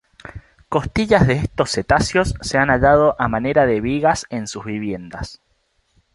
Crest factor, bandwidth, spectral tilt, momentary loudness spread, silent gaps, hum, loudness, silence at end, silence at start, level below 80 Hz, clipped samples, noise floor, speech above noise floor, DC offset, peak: 18 dB; 11.5 kHz; -5.5 dB/octave; 17 LU; none; none; -18 LUFS; 0.8 s; 0.25 s; -36 dBFS; under 0.1%; -65 dBFS; 47 dB; under 0.1%; -2 dBFS